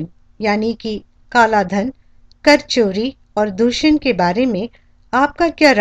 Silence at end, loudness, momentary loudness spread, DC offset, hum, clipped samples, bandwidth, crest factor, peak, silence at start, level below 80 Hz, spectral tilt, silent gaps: 0 s; -16 LUFS; 12 LU; under 0.1%; none; under 0.1%; 10.5 kHz; 16 dB; 0 dBFS; 0 s; -44 dBFS; -4.5 dB/octave; none